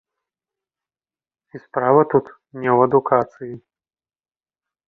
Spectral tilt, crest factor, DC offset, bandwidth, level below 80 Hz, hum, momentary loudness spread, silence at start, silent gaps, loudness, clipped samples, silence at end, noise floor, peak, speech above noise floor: -10.5 dB/octave; 20 dB; under 0.1%; 3.4 kHz; -66 dBFS; none; 19 LU; 1.55 s; none; -18 LUFS; under 0.1%; 1.3 s; under -90 dBFS; -2 dBFS; over 72 dB